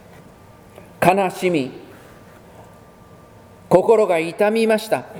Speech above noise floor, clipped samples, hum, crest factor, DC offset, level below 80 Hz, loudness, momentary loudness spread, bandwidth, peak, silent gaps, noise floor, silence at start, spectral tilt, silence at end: 28 dB; under 0.1%; none; 20 dB; under 0.1%; -56 dBFS; -18 LUFS; 8 LU; over 20 kHz; 0 dBFS; none; -45 dBFS; 1 s; -5.5 dB/octave; 0 s